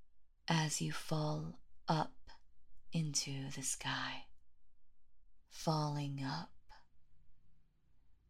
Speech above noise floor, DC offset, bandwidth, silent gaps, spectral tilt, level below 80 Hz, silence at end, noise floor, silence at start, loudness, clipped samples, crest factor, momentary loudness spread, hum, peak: 26 dB; under 0.1%; 15.5 kHz; none; -4 dB/octave; -66 dBFS; 0.15 s; -64 dBFS; 0 s; -39 LUFS; under 0.1%; 24 dB; 12 LU; none; -18 dBFS